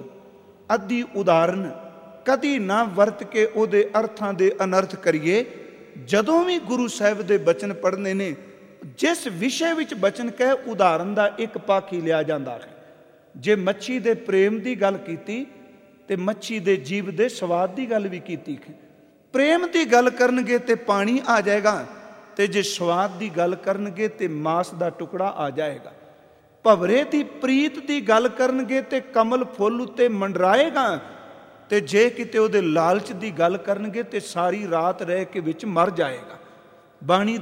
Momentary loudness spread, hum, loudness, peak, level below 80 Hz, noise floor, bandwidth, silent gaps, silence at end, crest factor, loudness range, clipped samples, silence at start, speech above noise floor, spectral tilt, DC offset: 11 LU; none; -22 LUFS; -2 dBFS; -72 dBFS; -53 dBFS; 16.5 kHz; none; 0 s; 22 dB; 4 LU; under 0.1%; 0 s; 32 dB; -5 dB/octave; under 0.1%